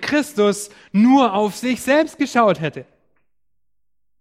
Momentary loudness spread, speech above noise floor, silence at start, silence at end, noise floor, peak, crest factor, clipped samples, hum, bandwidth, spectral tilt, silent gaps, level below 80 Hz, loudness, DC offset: 11 LU; 64 dB; 0 s; 1.4 s; -81 dBFS; -2 dBFS; 16 dB; under 0.1%; none; 15.5 kHz; -5 dB/octave; none; -62 dBFS; -18 LUFS; under 0.1%